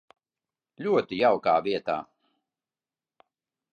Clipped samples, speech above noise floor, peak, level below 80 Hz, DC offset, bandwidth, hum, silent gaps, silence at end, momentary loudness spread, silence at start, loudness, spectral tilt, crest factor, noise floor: under 0.1%; over 65 dB; -10 dBFS; -70 dBFS; under 0.1%; 7.2 kHz; none; none; 1.7 s; 10 LU; 0.8 s; -26 LUFS; -7 dB/octave; 20 dB; under -90 dBFS